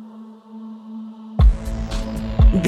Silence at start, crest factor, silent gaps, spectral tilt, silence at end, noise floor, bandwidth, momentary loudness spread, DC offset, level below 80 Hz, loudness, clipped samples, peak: 0 s; 16 dB; none; -7.5 dB/octave; 0 s; -40 dBFS; 8.6 kHz; 21 LU; under 0.1%; -20 dBFS; -21 LUFS; under 0.1%; -4 dBFS